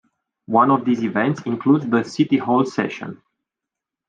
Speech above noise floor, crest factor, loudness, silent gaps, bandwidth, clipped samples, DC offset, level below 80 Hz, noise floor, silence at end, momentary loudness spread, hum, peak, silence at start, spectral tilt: 67 dB; 18 dB; -19 LUFS; none; 7.8 kHz; under 0.1%; under 0.1%; -68 dBFS; -86 dBFS; 0.95 s; 9 LU; none; -4 dBFS; 0.5 s; -7 dB/octave